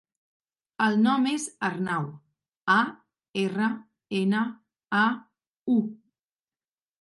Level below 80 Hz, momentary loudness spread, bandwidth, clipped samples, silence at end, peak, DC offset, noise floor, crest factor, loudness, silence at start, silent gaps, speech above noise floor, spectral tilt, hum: -76 dBFS; 13 LU; 11.5 kHz; under 0.1%; 1.05 s; -8 dBFS; under 0.1%; under -90 dBFS; 20 dB; -26 LUFS; 0.8 s; 3.29-3.34 s, 5.47-5.54 s, 5.61-5.66 s; over 65 dB; -5 dB/octave; none